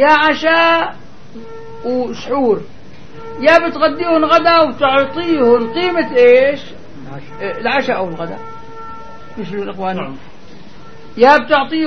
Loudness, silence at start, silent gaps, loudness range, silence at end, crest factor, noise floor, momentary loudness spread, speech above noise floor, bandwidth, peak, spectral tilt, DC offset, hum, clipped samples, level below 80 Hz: -13 LUFS; 0 s; none; 10 LU; 0 s; 14 dB; -39 dBFS; 23 LU; 26 dB; 6.6 kHz; 0 dBFS; -5.5 dB/octave; 3%; none; under 0.1%; -50 dBFS